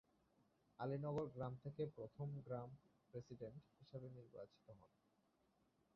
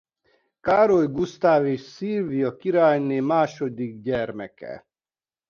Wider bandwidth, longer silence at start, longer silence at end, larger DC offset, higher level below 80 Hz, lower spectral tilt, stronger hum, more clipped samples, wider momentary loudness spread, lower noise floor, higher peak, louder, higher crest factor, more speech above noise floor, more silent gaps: second, 6.2 kHz vs 7 kHz; first, 0.8 s vs 0.65 s; first, 1.1 s vs 0.7 s; neither; second, -78 dBFS vs -60 dBFS; about the same, -8.5 dB/octave vs -7.5 dB/octave; neither; neither; about the same, 17 LU vs 15 LU; second, -82 dBFS vs under -90 dBFS; second, -34 dBFS vs -6 dBFS; second, -52 LUFS vs -22 LUFS; about the same, 18 dB vs 18 dB; second, 31 dB vs over 68 dB; neither